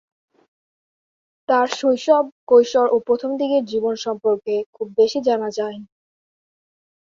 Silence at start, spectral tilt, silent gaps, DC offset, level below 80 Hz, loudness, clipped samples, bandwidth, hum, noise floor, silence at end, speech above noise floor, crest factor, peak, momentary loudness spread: 1.5 s; -4 dB/octave; 2.32-2.47 s, 4.66-4.73 s; under 0.1%; -66 dBFS; -19 LUFS; under 0.1%; 7.6 kHz; none; under -90 dBFS; 1.15 s; over 71 dB; 18 dB; -4 dBFS; 10 LU